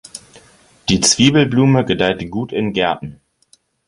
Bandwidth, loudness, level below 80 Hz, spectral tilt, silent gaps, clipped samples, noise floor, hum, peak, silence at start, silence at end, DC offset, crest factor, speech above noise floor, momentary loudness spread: 11.5 kHz; -15 LUFS; -44 dBFS; -4 dB/octave; none; under 0.1%; -56 dBFS; none; 0 dBFS; 0.15 s; 0.75 s; under 0.1%; 16 dB; 41 dB; 17 LU